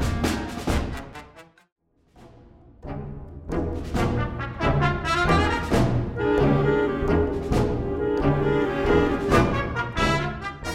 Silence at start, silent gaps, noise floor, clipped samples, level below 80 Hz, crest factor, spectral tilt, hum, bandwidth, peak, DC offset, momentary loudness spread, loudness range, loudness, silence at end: 0 s; 1.72-1.76 s; -53 dBFS; under 0.1%; -34 dBFS; 18 dB; -6.5 dB/octave; none; 15.5 kHz; -6 dBFS; under 0.1%; 15 LU; 11 LU; -23 LUFS; 0 s